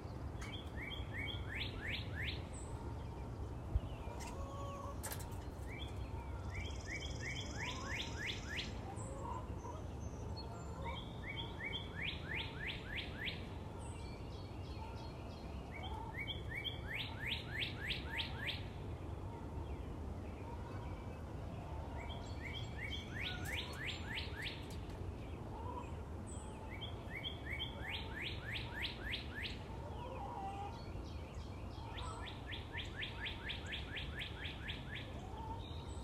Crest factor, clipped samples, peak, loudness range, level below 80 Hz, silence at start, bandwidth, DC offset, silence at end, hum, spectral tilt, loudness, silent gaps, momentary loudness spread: 20 dB; under 0.1%; -24 dBFS; 4 LU; -50 dBFS; 0 s; 16 kHz; under 0.1%; 0 s; none; -4.5 dB/octave; -45 LUFS; none; 6 LU